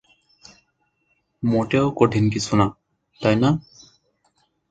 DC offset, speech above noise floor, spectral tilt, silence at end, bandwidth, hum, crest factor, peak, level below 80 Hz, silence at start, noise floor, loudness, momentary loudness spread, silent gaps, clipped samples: under 0.1%; 50 dB; -6.5 dB/octave; 1.1 s; 9.2 kHz; none; 22 dB; 0 dBFS; -50 dBFS; 1.4 s; -69 dBFS; -21 LUFS; 6 LU; none; under 0.1%